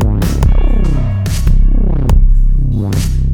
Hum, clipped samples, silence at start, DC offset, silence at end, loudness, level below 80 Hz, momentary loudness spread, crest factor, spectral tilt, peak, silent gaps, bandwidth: none; 0.2%; 0 s; under 0.1%; 0 s; -14 LUFS; -10 dBFS; 3 LU; 10 dB; -7 dB/octave; 0 dBFS; none; 13 kHz